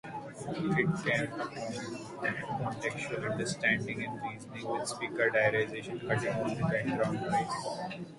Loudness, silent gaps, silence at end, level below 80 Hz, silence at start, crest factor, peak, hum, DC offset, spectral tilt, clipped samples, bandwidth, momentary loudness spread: -33 LUFS; none; 0 s; -64 dBFS; 0.05 s; 18 dB; -14 dBFS; none; under 0.1%; -5.5 dB/octave; under 0.1%; 11.5 kHz; 10 LU